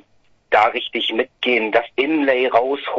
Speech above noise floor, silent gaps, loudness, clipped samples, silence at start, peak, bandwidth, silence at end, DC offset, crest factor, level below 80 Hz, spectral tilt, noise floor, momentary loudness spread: 38 dB; none; -18 LUFS; under 0.1%; 0.5 s; 0 dBFS; 7.6 kHz; 0 s; under 0.1%; 18 dB; -60 dBFS; -4.5 dB/octave; -57 dBFS; 5 LU